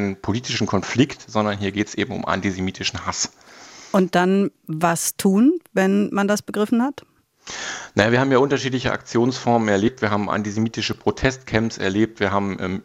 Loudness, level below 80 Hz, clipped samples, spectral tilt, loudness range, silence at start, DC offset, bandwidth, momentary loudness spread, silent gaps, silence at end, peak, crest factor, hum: -21 LUFS; -50 dBFS; under 0.1%; -5 dB/octave; 3 LU; 0 s; under 0.1%; 16.5 kHz; 8 LU; none; 0.05 s; -2 dBFS; 20 dB; none